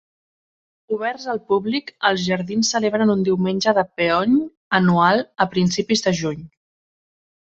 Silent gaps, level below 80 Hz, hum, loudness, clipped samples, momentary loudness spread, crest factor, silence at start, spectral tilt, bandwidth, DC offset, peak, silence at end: 4.57-4.71 s; -58 dBFS; none; -20 LUFS; under 0.1%; 8 LU; 18 dB; 0.9 s; -5 dB/octave; 8 kHz; under 0.1%; -2 dBFS; 1.1 s